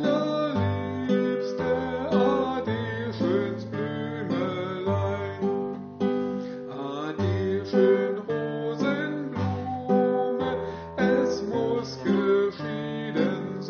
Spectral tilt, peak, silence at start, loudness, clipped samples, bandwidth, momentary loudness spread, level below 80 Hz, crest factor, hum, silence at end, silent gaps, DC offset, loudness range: -6 dB/octave; -8 dBFS; 0 s; -27 LUFS; under 0.1%; 6.8 kHz; 8 LU; -60 dBFS; 18 dB; none; 0 s; none; under 0.1%; 3 LU